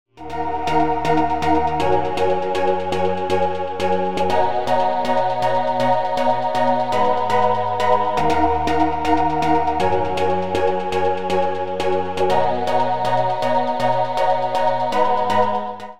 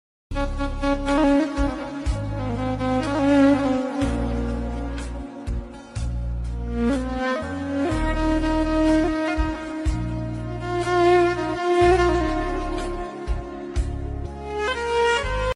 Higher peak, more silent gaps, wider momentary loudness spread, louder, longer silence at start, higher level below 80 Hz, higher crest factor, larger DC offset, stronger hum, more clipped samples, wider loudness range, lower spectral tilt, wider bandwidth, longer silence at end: first, -2 dBFS vs -8 dBFS; neither; second, 3 LU vs 13 LU; first, -19 LUFS vs -23 LUFS; second, 0.05 s vs 0.3 s; second, -46 dBFS vs -30 dBFS; about the same, 16 dB vs 14 dB; first, 5% vs under 0.1%; neither; neither; second, 2 LU vs 6 LU; about the same, -6 dB/octave vs -6.5 dB/octave; first, 15 kHz vs 11.5 kHz; about the same, 0 s vs 0 s